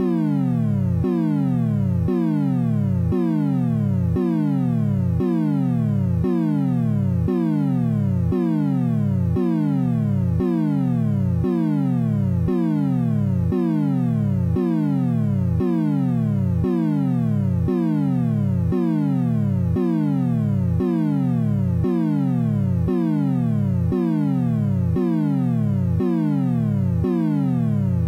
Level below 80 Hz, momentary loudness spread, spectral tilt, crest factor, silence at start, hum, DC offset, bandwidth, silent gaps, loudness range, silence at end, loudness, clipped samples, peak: -42 dBFS; 0 LU; -10.5 dB/octave; 10 dB; 0 s; none; under 0.1%; 6.4 kHz; none; 0 LU; 0 s; -21 LUFS; under 0.1%; -10 dBFS